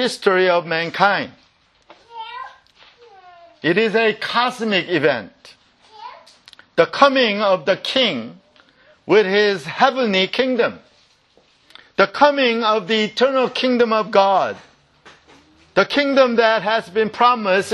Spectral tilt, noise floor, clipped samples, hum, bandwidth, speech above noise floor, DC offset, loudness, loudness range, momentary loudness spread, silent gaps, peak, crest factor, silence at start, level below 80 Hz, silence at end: -4.5 dB/octave; -57 dBFS; under 0.1%; none; 12 kHz; 40 dB; under 0.1%; -17 LUFS; 4 LU; 13 LU; none; 0 dBFS; 18 dB; 0 s; -66 dBFS; 0 s